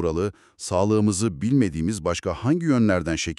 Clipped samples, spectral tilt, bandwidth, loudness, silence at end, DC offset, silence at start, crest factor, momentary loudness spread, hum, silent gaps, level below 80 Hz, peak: under 0.1%; -6 dB/octave; 12.5 kHz; -23 LUFS; 0.05 s; under 0.1%; 0 s; 14 dB; 7 LU; none; none; -44 dBFS; -8 dBFS